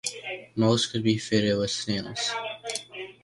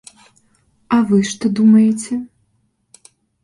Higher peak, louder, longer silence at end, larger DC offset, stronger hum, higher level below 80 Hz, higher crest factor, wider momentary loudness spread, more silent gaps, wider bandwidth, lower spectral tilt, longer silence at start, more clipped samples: second, -8 dBFS vs -4 dBFS; second, -27 LUFS vs -15 LUFS; second, 0.1 s vs 1.2 s; neither; neither; about the same, -58 dBFS vs -58 dBFS; about the same, 18 dB vs 14 dB; second, 11 LU vs 14 LU; neither; about the same, 11.5 kHz vs 11.5 kHz; second, -4.5 dB/octave vs -6 dB/octave; second, 0.05 s vs 0.9 s; neither